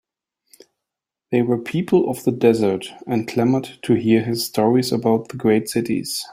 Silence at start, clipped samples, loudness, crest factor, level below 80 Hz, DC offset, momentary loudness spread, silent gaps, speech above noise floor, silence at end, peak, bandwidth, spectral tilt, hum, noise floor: 1.3 s; under 0.1%; -20 LUFS; 18 dB; -60 dBFS; under 0.1%; 6 LU; none; 66 dB; 0 s; -2 dBFS; 16 kHz; -6 dB/octave; none; -85 dBFS